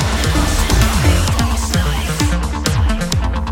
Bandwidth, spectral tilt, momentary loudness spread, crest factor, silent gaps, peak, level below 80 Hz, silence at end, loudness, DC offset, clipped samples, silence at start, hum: 17 kHz; -4.5 dB/octave; 4 LU; 14 dB; none; 0 dBFS; -18 dBFS; 0 s; -16 LUFS; under 0.1%; under 0.1%; 0 s; none